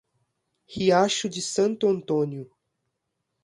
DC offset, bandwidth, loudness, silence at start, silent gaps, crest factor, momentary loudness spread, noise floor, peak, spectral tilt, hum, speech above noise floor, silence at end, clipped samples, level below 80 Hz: under 0.1%; 11.5 kHz; -24 LUFS; 0.7 s; none; 18 dB; 11 LU; -79 dBFS; -8 dBFS; -4.5 dB/octave; none; 56 dB; 1 s; under 0.1%; -66 dBFS